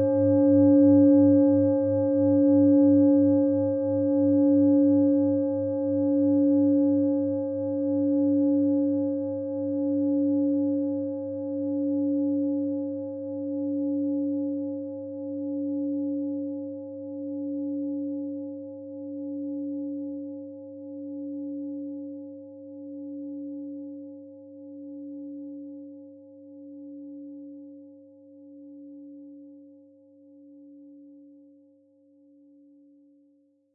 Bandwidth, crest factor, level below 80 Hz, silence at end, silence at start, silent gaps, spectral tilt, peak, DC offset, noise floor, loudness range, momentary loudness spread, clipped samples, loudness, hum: 1.7 kHz; 16 dB; -78 dBFS; 2.65 s; 0 s; none; -15 dB/octave; -10 dBFS; under 0.1%; -64 dBFS; 21 LU; 23 LU; under 0.1%; -24 LUFS; none